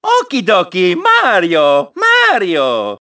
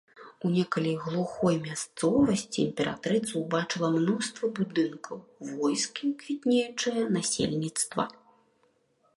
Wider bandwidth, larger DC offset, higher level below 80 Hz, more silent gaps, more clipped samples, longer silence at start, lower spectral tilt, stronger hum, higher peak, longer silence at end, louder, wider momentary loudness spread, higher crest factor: second, 8 kHz vs 11.5 kHz; neither; about the same, -64 dBFS vs -64 dBFS; neither; neither; about the same, 0.05 s vs 0.15 s; about the same, -4 dB/octave vs -4.5 dB/octave; neither; first, 0 dBFS vs -10 dBFS; second, 0.05 s vs 1.05 s; first, -11 LUFS vs -29 LUFS; about the same, 5 LU vs 6 LU; second, 12 dB vs 20 dB